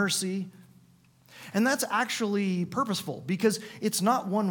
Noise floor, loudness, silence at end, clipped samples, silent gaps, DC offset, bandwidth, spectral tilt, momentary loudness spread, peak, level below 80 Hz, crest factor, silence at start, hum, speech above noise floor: -60 dBFS; -28 LUFS; 0 s; under 0.1%; none; under 0.1%; 19 kHz; -4 dB/octave; 7 LU; -12 dBFS; -74 dBFS; 18 dB; 0 s; none; 32 dB